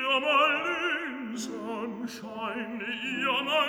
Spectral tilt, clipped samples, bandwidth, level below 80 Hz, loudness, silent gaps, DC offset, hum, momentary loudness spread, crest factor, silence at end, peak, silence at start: -3 dB/octave; under 0.1%; over 20 kHz; -72 dBFS; -29 LUFS; none; under 0.1%; none; 13 LU; 18 dB; 0 s; -12 dBFS; 0 s